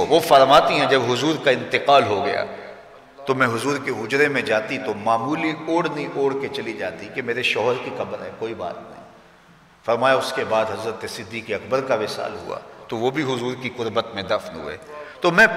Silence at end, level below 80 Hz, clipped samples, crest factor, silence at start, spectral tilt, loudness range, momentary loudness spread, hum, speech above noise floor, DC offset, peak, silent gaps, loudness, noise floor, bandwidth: 0 s; -60 dBFS; under 0.1%; 18 dB; 0 s; -4.5 dB/octave; 6 LU; 16 LU; none; 30 dB; under 0.1%; -4 dBFS; none; -21 LUFS; -51 dBFS; 16 kHz